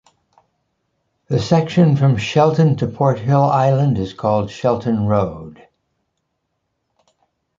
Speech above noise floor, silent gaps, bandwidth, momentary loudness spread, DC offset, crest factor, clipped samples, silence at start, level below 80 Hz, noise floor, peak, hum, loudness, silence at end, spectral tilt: 57 dB; none; 7.6 kHz; 6 LU; under 0.1%; 16 dB; under 0.1%; 1.3 s; -48 dBFS; -73 dBFS; -2 dBFS; none; -16 LUFS; 2.05 s; -8 dB/octave